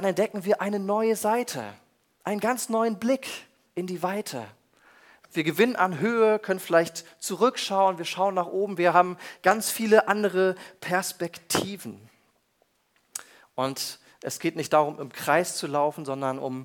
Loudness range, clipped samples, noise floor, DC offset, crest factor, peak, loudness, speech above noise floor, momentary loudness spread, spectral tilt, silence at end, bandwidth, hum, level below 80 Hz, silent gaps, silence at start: 7 LU; under 0.1%; -69 dBFS; under 0.1%; 22 dB; -4 dBFS; -26 LUFS; 44 dB; 14 LU; -4 dB/octave; 0 s; 19 kHz; none; -72 dBFS; none; 0 s